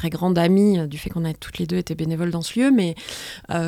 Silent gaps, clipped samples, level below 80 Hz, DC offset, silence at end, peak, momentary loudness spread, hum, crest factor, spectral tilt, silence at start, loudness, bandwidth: none; under 0.1%; -48 dBFS; under 0.1%; 0 s; -6 dBFS; 12 LU; none; 14 dB; -6.5 dB/octave; 0 s; -21 LUFS; 16 kHz